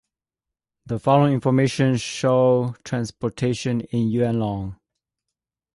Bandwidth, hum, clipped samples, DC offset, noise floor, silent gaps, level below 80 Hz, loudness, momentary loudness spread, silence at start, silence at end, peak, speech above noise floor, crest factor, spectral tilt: 11.5 kHz; none; under 0.1%; under 0.1%; -88 dBFS; none; -52 dBFS; -21 LUFS; 10 LU; 0.85 s; 1 s; -4 dBFS; 67 dB; 18 dB; -6.5 dB/octave